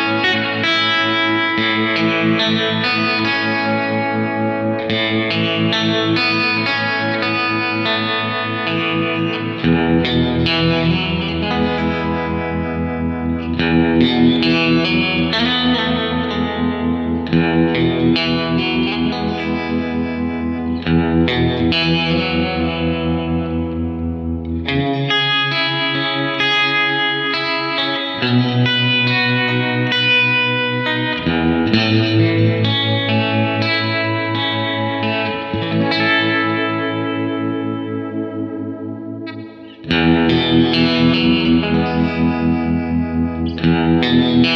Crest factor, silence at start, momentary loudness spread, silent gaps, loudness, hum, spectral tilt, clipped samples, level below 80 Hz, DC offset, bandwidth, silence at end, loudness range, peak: 16 dB; 0 s; 7 LU; none; -16 LUFS; none; -6.5 dB/octave; under 0.1%; -38 dBFS; under 0.1%; 7 kHz; 0 s; 3 LU; -2 dBFS